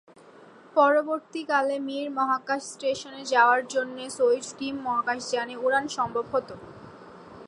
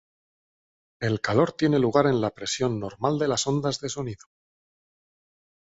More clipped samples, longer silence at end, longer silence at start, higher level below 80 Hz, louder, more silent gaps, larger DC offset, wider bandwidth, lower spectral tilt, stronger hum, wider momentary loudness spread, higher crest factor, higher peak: neither; second, 0 s vs 1.45 s; second, 0.25 s vs 1 s; second, -68 dBFS vs -58 dBFS; about the same, -26 LUFS vs -25 LUFS; neither; neither; first, 11.5 kHz vs 8 kHz; second, -3 dB/octave vs -5 dB/octave; neither; about the same, 12 LU vs 11 LU; about the same, 20 dB vs 20 dB; about the same, -6 dBFS vs -6 dBFS